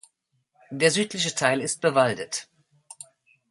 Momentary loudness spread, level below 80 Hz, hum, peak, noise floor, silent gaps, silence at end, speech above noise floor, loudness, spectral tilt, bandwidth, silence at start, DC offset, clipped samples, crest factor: 22 LU; -70 dBFS; none; -4 dBFS; -72 dBFS; none; 1.05 s; 48 dB; -24 LUFS; -3 dB/octave; 11.5 kHz; 0.7 s; under 0.1%; under 0.1%; 22 dB